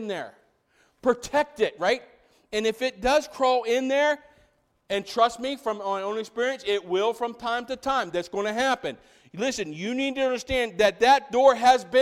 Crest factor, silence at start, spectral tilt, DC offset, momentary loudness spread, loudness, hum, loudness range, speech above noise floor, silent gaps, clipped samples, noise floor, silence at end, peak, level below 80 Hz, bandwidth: 20 dB; 0 s; -3 dB/octave; under 0.1%; 11 LU; -25 LUFS; none; 4 LU; 41 dB; none; under 0.1%; -65 dBFS; 0 s; -6 dBFS; -54 dBFS; 15 kHz